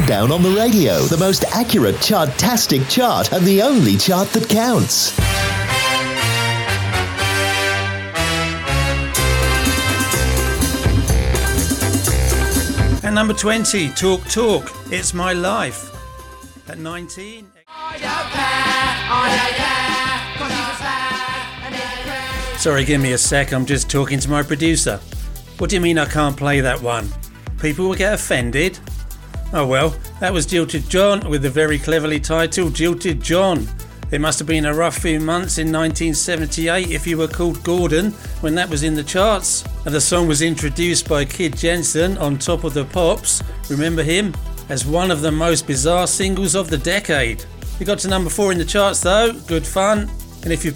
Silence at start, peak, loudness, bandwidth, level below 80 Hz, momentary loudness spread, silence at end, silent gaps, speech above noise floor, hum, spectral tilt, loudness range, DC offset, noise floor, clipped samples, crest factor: 0 s; -4 dBFS; -17 LUFS; 19 kHz; -28 dBFS; 9 LU; 0 s; none; 20 dB; none; -4 dB/octave; 5 LU; under 0.1%; -37 dBFS; under 0.1%; 14 dB